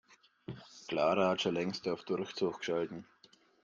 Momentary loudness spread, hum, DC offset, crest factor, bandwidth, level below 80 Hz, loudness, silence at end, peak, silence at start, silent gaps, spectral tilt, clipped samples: 19 LU; none; under 0.1%; 18 dB; 7.6 kHz; -74 dBFS; -34 LUFS; 0.6 s; -18 dBFS; 0.5 s; none; -5 dB/octave; under 0.1%